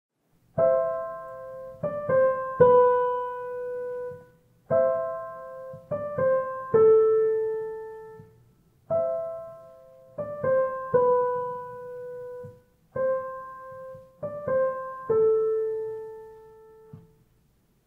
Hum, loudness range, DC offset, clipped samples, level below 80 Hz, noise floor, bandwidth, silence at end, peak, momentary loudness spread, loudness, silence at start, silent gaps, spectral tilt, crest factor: none; 7 LU; under 0.1%; under 0.1%; -66 dBFS; -65 dBFS; 3.2 kHz; 0.85 s; -6 dBFS; 21 LU; -25 LUFS; 0.55 s; none; -9 dB/octave; 20 dB